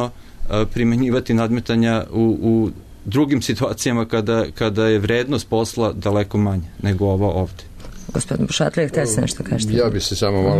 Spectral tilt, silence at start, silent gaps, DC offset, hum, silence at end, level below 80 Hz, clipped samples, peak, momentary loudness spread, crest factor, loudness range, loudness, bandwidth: -5.5 dB/octave; 0 s; none; under 0.1%; none; 0 s; -36 dBFS; under 0.1%; -6 dBFS; 7 LU; 12 dB; 2 LU; -19 LUFS; 13.5 kHz